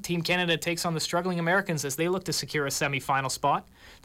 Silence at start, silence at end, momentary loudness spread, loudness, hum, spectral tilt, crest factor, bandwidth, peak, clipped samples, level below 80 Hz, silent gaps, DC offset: 0 s; 0.1 s; 3 LU; -27 LUFS; none; -3.5 dB/octave; 14 dB; 16.5 kHz; -14 dBFS; under 0.1%; -60 dBFS; none; under 0.1%